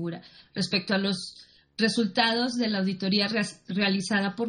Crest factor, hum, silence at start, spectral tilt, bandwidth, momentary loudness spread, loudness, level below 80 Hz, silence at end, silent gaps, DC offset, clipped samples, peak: 20 dB; none; 0 s; -4.5 dB/octave; 10 kHz; 13 LU; -26 LUFS; -68 dBFS; 0 s; none; under 0.1%; under 0.1%; -8 dBFS